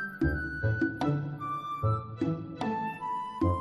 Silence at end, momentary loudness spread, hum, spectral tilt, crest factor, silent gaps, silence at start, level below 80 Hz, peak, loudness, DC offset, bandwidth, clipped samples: 0 s; 5 LU; none; -8.5 dB/octave; 16 dB; none; 0 s; -46 dBFS; -16 dBFS; -32 LUFS; under 0.1%; 12.5 kHz; under 0.1%